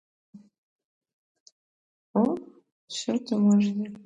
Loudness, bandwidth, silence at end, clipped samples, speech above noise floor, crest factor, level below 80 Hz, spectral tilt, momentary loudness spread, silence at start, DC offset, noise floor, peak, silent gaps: -26 LUFS; 8 kHz; 0.05 s; under 0.1%; over 66 dB; 18 dB; -74 dBFS; -6.5 dB/octave; 13 LU; 0.35 s; under 0.1%; under -90 dBFS; -12 dBFS; 0.58-0.79 s, 0.85-1.01 s, 1.13-1.46 s, 1.52-2.14 s, 2.72-2.88 s